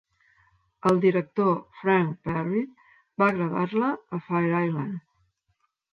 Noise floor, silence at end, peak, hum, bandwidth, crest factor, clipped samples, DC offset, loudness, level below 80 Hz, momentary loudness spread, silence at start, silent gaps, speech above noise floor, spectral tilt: -74 dBFS; 0.95 s; -10 dBFS; none; 11 kHz; 16 dB; under 0.1%; under 0.1%; -25 LUFS; -64 dBFS; 11 LU; 0.85 s; none; 49 dB; -8.5 dB/octave